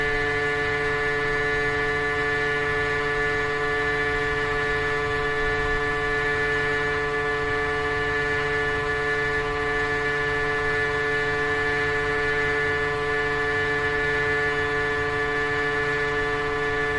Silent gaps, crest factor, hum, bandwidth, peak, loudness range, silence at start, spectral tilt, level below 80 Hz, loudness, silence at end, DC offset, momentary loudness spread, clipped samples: none; 12 dB; none; 11.5 kHz; -12 dBFS; 1 LU; 0 s; -4.5 dB/octave; -40 dBFS; -23 LUFS; 0 s; under 0.1%; 2 LU; under 0.1%